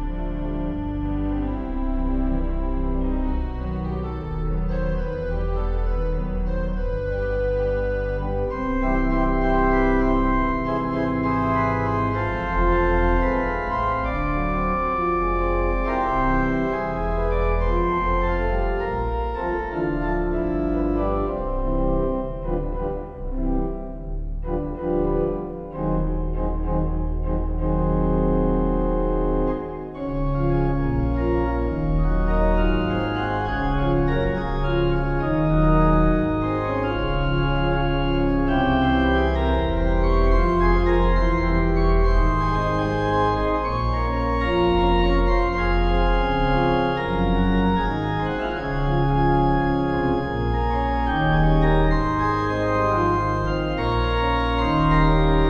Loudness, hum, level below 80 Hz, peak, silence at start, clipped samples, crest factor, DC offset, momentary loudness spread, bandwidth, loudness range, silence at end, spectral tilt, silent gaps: -23 LUFS; none; -24 dBFS; -6 dBFS; 0 s; under 0.1%; 14 dB; under 0.1%; 8 LU; 6.6 kHz; 6 LU; 0 s; -8.5 dB/octave; none